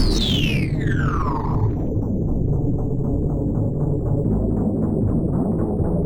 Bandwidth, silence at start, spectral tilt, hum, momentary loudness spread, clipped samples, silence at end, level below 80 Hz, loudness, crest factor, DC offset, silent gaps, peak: 18 kHz; 0 s; -7 dB/octave; none; 3 LU; under 0.1%; 0 s; -28 dBFS; -22 LUFS; 14 dB; under 0.1%; none; -6 dBFS